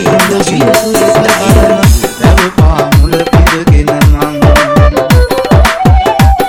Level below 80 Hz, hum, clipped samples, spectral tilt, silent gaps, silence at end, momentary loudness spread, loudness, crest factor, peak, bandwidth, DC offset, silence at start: -12 dBFS; none; 3%; -5.5 dB/octave; none; 0 s; 2 LU; -7 LUFS; 6 dB; 0 dBFS; 20 kHz; under 0.1%; 0 s